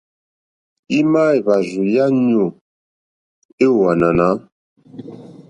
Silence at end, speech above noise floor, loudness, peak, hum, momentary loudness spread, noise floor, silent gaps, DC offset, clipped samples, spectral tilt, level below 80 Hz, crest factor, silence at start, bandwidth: 0.2 s; 21 dB; -16 LUFS; -2 dBFS; none; 18 LU; -35 dBFS; 2.61-3.58 s, 4.52-4.76 s; under 0.1%; under 0.1%; -7.5 dB/octave; -50 dBFS; 16 dB; 0.9 s; 9.8 kHz